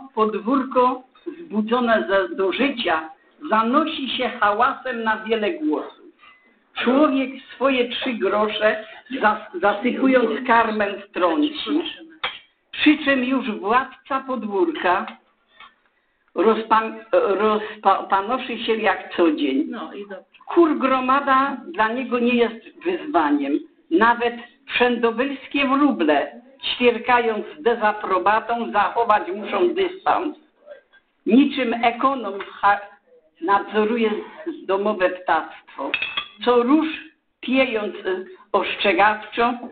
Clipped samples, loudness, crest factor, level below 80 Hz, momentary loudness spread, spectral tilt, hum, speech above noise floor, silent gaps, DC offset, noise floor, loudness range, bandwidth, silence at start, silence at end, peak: under 0.1%; -21 LUFS; 18 dB; -60 dBFS; 11 LU; -8.5 dB/octave; none; 45 dB; none; under 0.1%; -65 dBFS; 2 LU; 4.7 kHz; 0 s; 0 s; -4 dBFS